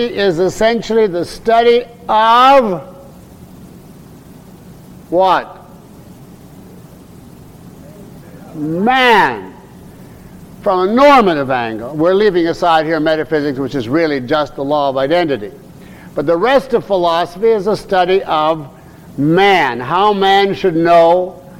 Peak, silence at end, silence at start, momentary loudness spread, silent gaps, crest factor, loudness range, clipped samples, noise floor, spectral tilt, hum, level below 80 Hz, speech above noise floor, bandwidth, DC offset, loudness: -2 dBFS; 0 s; 0 s; 12 LU; none; 12 dB; 9 LU; under 0.1%; -37 dBFS; -5.5 dB/octave; none; -44 dBFS; 25 dB; 16.5 kHz; under 0.1%; -13 LUFS